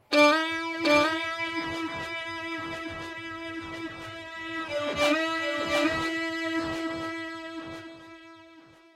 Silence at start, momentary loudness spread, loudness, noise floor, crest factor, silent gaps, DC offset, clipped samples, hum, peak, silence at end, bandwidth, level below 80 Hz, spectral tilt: 0.1 s; 16 LU; -28 LUFS; -53 dBFS; 22 dB; none; under 0.1%; under 0.1%; none; -6 dBFS; 0.35 s; 16 kHz; -60 dBFS; -3.5 dB/octave